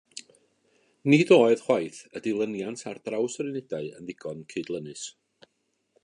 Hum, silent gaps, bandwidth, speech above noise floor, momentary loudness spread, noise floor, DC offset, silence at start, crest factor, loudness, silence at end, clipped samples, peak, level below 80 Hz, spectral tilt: none; none; 11 kHz; 50 dB; 19 LU; -75 dBFS; under 0.1%; 0.15 s; 22 dB; -26 LUFS; 0.95 s; under 0.1%; -6 dBFS; -74 dBFS; -5.5 dB/octave